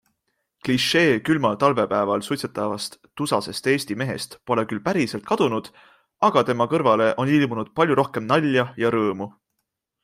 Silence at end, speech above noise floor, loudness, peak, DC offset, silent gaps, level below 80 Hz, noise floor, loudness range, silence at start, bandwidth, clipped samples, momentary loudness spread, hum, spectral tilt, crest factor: 0.75 s; 57 dB; -22 LUFS; -2 dBFS; under 0.1%; none; -62 dBFS; -79 dBFS; 4 LU; 0.65 s; 16 kHz; under 0.1%; 9 LU; none; -5.5 dB/octave; 20 dB